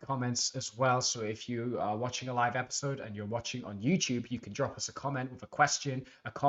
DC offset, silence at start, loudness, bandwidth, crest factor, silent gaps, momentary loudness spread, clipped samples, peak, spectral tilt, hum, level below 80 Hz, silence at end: under 0.1%; 0 s; -33 LUFS; 8.2 kHz; 22 dB; none; 10 LU; under 0.1%; -10 dBFS; -4 dB/octave; none; -68 dBFS; 0 s